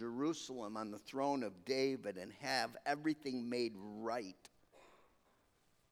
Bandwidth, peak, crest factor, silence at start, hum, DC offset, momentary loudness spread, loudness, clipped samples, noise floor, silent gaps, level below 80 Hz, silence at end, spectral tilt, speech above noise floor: 16 kHz; -22 dBFS; 20 dB; 0 s; none; under 0.1%; 8 LU; -41 LUFS; under 0.1%; -75 dBFS; none; -82 dBFS; 0.95 s; -4 dB/octave; 34 dB